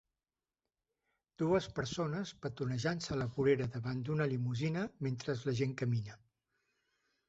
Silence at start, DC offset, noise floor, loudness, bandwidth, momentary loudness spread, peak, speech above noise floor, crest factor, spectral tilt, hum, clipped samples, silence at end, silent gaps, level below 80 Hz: 1.4 s; under 0.1%; under -90 dBFS; -36 LUFS; 8 kHz; 7 LU; -18 dBFS; over 54 dB; 18 dB; -6.5 dB/octave; none; under 0.1%; 1.15 s; none; -64 dBFS